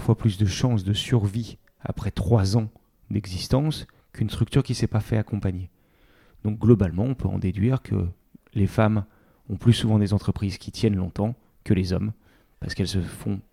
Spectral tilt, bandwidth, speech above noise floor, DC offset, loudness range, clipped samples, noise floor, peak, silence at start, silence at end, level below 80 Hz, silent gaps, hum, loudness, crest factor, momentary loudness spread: -7 dB/octave; 14 kHz; 35 dB; under 0.1%; 3 LU; under 0.1%; -58 dBFS; -4 dBFS; 0 s; 0.1 s; -44 dBFS; none; none; -25 LUFS; 20 dB; 14 LU